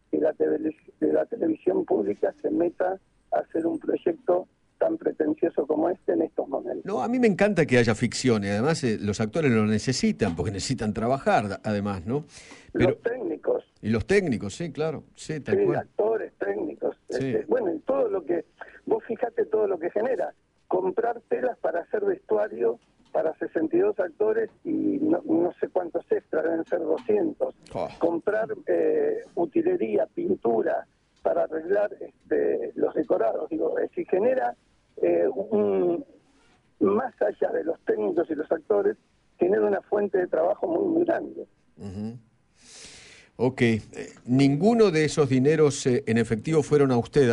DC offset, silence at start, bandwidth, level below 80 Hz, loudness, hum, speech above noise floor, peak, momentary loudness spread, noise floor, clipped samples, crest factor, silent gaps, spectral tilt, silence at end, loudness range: under 0.1%; 0.1 s; 11 kHz; -56 dBFS; -26 LUFS; none; 36 dB; -8 dBFS; 9 LU; -61 dBFS; under 0.1%; 18 dB; none; -6.5 dB/octave; 0 s; 4 LU